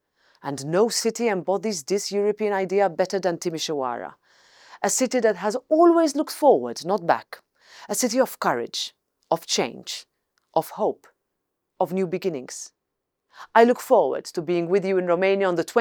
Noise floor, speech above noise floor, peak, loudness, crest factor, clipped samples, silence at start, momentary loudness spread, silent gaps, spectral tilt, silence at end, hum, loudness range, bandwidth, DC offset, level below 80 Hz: -81 dBFS; 58 dB; -4 dBFS; -23 LUFS; 20 dB; under 0.1%; 0.45 s; 14 LU; none; -4 dB/octave; 0 s; none; 7 LU; over 20 kHz; under 0.1%; -78 dBFS